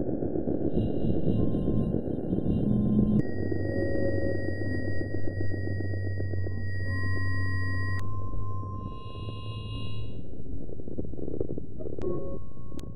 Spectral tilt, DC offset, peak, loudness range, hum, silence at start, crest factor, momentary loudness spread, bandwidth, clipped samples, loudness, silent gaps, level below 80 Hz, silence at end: -9.5 dB/octave; under 0.1%; -10 dBFS; 10 LU; none; 0 s; 16 dB; 12 LU; 9.2 kHz; under 0.1%; -31 LUFS; none; -42 dBFS; 0 s